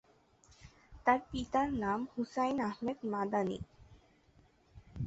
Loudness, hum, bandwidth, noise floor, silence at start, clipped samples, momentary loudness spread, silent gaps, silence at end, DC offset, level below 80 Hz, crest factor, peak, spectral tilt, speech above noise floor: -35 LUFS; none; 8 kHz; -67 dBFS; 0.6 s; under 0.1%; 7 LU; none; 0 s; under 0.1%; -58 dBFS; 22 dB; -16 dBFS; -5 dB/octave; 32 dB